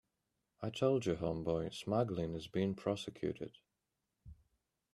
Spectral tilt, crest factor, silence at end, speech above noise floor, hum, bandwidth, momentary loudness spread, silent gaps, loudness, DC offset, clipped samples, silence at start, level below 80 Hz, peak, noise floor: -6.5 dB/octave; 20 dB; 0.6 s; 50 dB; none; 12.5 kHz; 10 LU; none; -38 LUFS; under 0.1%; under 0.1%; 0.6 s; -64 dBFS; -20 dBFS; -88 dBFS